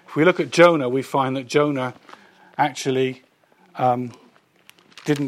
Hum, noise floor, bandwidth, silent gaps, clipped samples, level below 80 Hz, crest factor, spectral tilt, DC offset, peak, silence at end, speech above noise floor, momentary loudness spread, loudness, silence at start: none; -57 dBFS; 15 kHz; none; under 0.1%; -70 dBFS; 20 dB; -5.5 dB/octave; under 0.1%; 0 dBFS; 0 s; 38 dB; 18 LU; -20 LUFS; 0.1 s